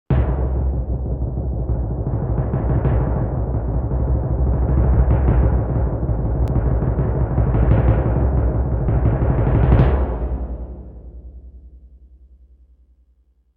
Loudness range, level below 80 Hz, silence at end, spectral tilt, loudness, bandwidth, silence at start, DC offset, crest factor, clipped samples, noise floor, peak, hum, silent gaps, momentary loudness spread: 4 LU; -22 dBFS; 1.7 s; -12 dB/octave; -20 LUFS; 3.4 kHz; 0.1 s; under 0.1%; 16 dB; under 0.1%; -58 dBFS; -2 dBFS; none; none; 8 LU